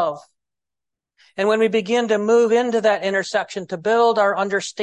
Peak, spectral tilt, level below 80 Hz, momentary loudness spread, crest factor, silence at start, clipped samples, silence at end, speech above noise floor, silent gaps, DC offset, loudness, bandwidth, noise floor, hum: -4 dBFS; -4 dB/octave; -70 dBFS; 9 LU; 16 dB; 0 s; under 0.1%; 0 s; over 72 dB; none; under 0.1%; -19 LUFS; 10.5 kHz; under -90 dBFS; none